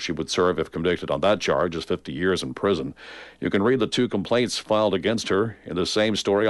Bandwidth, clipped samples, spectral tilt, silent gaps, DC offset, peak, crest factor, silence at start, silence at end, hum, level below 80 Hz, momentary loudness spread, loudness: 11.5 kHz; under 0.1%; -4.5 dB/octave; none; under 0.1%; -8 dBFS; 14 dB; 0 s; 0 s; none; -52 dBFS; 6 LU; -23 LUFS